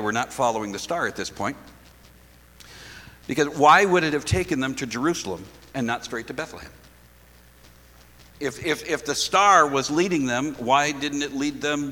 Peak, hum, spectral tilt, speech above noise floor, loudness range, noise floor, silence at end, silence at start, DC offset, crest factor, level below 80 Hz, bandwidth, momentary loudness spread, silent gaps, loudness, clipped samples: -4 dBFS; none; -4 dB/octave; 29 dB; 11 LU; -52 dBFS; 0 s; 0 s; under 0.1%; 20 dB; -50 dBFS; 19 kHz; 19 LU; none; -23 LUFS; under 0.1%